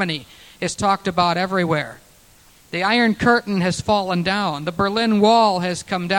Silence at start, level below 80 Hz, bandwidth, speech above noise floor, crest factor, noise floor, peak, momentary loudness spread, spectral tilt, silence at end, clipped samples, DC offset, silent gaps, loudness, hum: 0 s; -50 dBFS; 17 kHz; 32 dB; 18 dB; -51 dBFS; -2 dBFS; 9 LU; -5 dB/octave; 0 s; under 0.1%; under 0.1%; none; -19 LUFS; none